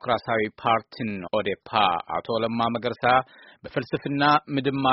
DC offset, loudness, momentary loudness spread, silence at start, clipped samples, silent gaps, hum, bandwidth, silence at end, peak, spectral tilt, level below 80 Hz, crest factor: under 0.1%; -24 LUFS; 11 LU; 0.05 s; under 0.1%; none; none; 5.8 kHz; 0 s; -4 dBFS; -3 dB/octave; -58 dBFS; 20 dB